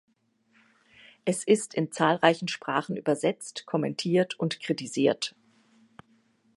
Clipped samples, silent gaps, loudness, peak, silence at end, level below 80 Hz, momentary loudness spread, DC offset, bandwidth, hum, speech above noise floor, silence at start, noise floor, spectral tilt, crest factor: under 0.1%; none; -27 LUFS; -4 dBFS; 1.3 s; -78 dBFS; 8 LU; under 0.1%; 11.5 kHz; none; 42 dB; 1.25 s; -69 dBFS; -4.5 dB/octave; 26 dB